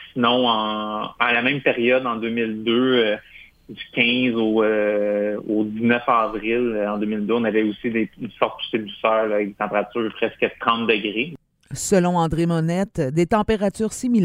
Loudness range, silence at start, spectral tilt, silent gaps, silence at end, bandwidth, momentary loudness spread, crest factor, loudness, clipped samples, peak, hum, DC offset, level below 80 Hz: 2 LU; 0 s; -5 dB/octave; none; 0 s; 15 kHz; 7 LU; 20 dB; -21 LUFS; under 0.1%; -2 dBFS; none; under 0.1%; -50 dBFS